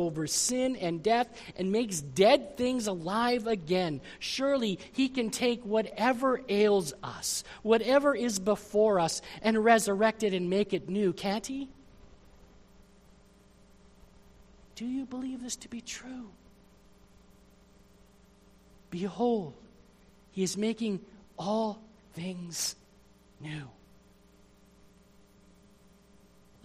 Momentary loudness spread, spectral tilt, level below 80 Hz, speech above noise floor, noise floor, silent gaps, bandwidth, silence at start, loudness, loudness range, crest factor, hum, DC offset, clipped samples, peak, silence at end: 16 LU; -4 dB/octave; -62 dBFS; 31 dB; -60 dBFS; none; 15 kHz; 0 s; -30 LUFS; 17 LU; 22 dB; none; under 0.1%; under 0.1%; -8 dBFS; 2.95 s